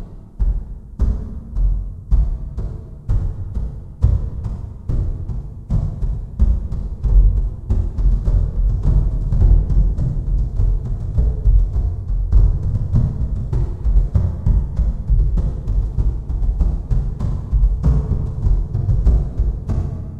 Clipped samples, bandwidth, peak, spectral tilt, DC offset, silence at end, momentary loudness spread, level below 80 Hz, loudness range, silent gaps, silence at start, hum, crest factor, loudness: under 0.1%; 1.7 kHz; -2 dBFS; -10.5 dB/octave; 1%; 0 s; 10 LU; -18 dBFS; 5 LU; none; 0 s; none; 16 dB; -21 LUFS